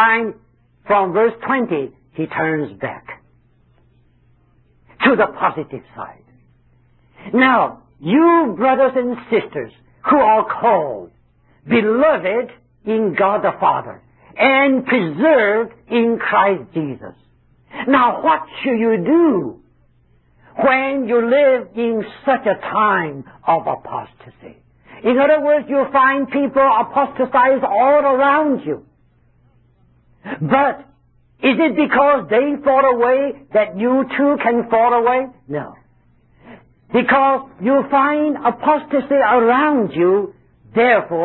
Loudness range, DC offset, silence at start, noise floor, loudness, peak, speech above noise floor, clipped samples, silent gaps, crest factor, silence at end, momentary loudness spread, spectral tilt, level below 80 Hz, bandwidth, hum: 6 LU; under 0.1%; 0 s; -55 dBFS; -16 LUFS; 0 dBFS; 40 dB; under 0.1%; none; 16 dB; 0 s; 14 LU; -10.5 dB/octave; -56 dBFS; 4.2 kHz; none